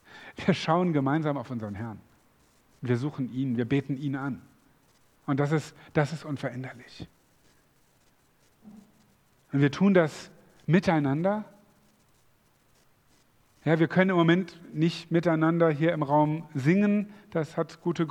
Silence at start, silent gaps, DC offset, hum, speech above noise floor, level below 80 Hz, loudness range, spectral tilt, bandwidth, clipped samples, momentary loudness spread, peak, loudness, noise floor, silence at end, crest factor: 0.15 s; none; under 0.1%; none; 38 dB; -66 dBFS; 8 LU; -7.5 dB/octave; 10.5 kHz; under 0.1%; 17 LU; -6 dBFS; -27 LUFS; -65 dBFS; 0 s; 22 dB